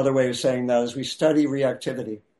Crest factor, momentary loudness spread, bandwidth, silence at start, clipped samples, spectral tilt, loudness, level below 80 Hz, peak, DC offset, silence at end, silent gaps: 14 dB; 9 LU; 11.5 kHz; 0 s; under 0.1%; -5.5 dB/octave; -23 LUFS; -64 dBFS; -8 dBFS; under 0.1%; 0.2 s; none